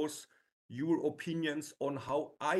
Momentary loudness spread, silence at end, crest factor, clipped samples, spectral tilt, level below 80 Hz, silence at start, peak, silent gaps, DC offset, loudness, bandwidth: 8 LU; 0 s; 18 dB; under 0.1%; -5 dB/octave; -76 dBFS; 0 s; -18 dBFS; 0.52-0.69 s; under 0.1%; -36 LUFS; 12.5 kHz